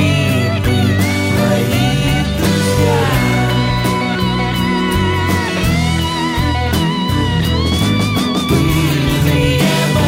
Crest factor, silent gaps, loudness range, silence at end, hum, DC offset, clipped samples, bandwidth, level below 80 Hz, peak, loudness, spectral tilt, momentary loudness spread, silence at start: 12 dB; none; 1 LU; 0 s; none; 0.2%; under 0.1%; 16.5 kHz; -26 dBFS; -2 dBFS; -14 LUFS; -5.5 dB/octave; 3 LU; 0 s